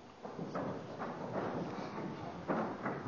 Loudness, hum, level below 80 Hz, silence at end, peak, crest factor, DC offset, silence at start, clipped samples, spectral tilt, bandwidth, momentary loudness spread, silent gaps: -41 LUFS; none; -68 dBFS; 0 s; -22 dBFS; 18 dB; under 0.1%; 0 s; under 0.1%; -7 dB/octave; 7.2 kHz; 6 LU; none